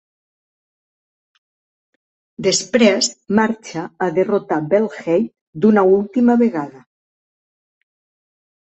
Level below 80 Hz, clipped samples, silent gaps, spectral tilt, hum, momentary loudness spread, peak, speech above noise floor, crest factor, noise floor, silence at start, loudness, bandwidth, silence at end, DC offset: -62 dBFS; under 0.1%; 5.41-5.53 s; -4.5 dB/octave; none; 11 LU; -2 dBFS; over 74 dB; 18 dB; under -90 dBFS; 2.4 s; -17 LUFS; 8.4 kHz; 1.9 s; under 0.1%